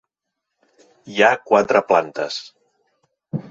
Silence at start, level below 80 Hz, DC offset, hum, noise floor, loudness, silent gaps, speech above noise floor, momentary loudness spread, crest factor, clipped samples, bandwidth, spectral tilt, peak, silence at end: 1.05 s; -66 dBFS; under 0.1%; none; -80 dBFS; -18 LUFS; none; 63 dB; 15 LU; 20 dB; under 0.1%; 7.8 kHz; -4.5 dB/octave; -2 dBFS; 0.1 s